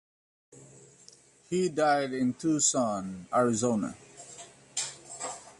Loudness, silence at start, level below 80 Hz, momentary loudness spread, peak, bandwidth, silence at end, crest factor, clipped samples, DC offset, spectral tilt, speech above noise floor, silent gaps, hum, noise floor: -29 LUFS; 0.55 s; -68 dBFS; 20 LU; -14 dBFS; 11.5 kHz; 0.1 s; 18 dB; under 0.1%; under 0.1%; -4 dB/octave; 29 dB; none; none; -57 dBFS